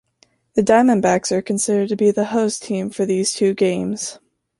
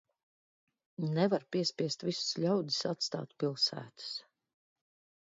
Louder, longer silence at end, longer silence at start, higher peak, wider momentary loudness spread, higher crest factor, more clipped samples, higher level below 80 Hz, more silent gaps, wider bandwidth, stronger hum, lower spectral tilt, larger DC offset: first, -18 LUFS vs -34 LUFS; second, 0.45 s vs 1 s; second, 0.55 s vs 1 s; first, -2 dBFS vs -16 dBFS; about the same, 10 LU vs 11 LU; about the same, 16 dB vs 20 dB; neither; first, -58 dBFS vs -82 dBFS; neither; first, 11.5 kHz vs 7.8 kHz; neither; about the same, -4.5 dB/octave vs -5 dB/octave; neither